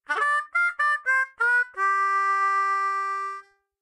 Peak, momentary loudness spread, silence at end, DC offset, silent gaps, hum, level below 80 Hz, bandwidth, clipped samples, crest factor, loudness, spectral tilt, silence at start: -14 dBFS; 6 LU; 0.4 s; under 0.1%; none; none; -82 dBFS; 11.5 kHz; under 0.1%; 12 dB; -23 LUFS; 1 dB/octave; 0.1 s